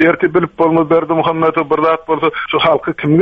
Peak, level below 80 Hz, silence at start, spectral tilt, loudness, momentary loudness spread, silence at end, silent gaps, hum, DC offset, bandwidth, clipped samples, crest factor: 0 dBFS; -50 dBFS; 0 s; -8.5 dB/octave; -14 LUFS; 3 LU; 0 s; none; none; under 0.1%; 5 kHz; under 0.1%; 12 dB